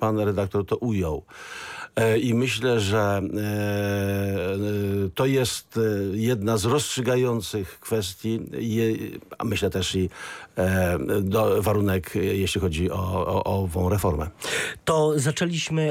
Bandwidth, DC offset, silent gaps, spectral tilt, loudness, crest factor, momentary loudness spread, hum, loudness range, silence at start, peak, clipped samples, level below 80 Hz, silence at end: 16.5 kHz; under 0.1%; none; -5.5 dB/octave; -25 LUFS; 14 dB; 7 LU; none; 2 LU; 0 s; -10 dBFS; under 0.1%; -46 dBFS; 0 s